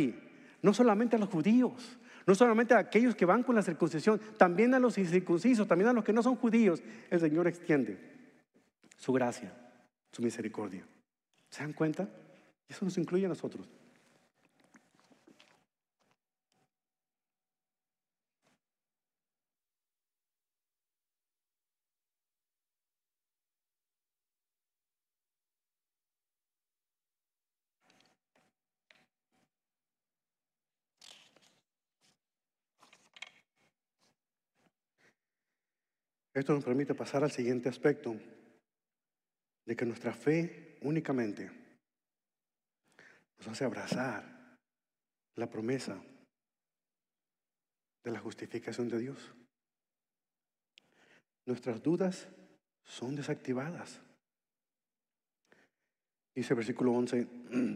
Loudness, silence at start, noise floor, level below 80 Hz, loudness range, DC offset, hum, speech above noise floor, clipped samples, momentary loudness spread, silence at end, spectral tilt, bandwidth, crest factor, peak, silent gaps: -32 LUFS; 0 s; under -90 dBFS; under -90 dBFS; 15 LU; under 0.1%; none; over 59 dB; under 0.1%; 20 LU; 0 s; -6.5 dB/octave; 11.5 kHz; 26 dB; -10 dBFS; none